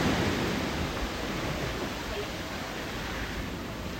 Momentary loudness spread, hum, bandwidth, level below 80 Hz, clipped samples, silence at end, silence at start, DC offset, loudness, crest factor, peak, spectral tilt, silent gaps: 7 LU; none; 16.5 kHz; -42 dBFS; under 0.1%; 0 s; 0 s; under 0.1%; -32 LUFS; 16 dB; -16 dBFS; -4.5 dB/octave; none